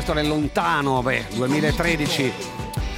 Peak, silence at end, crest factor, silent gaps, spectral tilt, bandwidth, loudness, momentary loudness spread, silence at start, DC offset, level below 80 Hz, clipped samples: -6 dBFS; 0 s; 16 dB; none; -5 dB/octave; 16.5 kHz; -22 LUFS; 7 LU; 0 s; under 0.1%; -34 dBFS; under 0.1%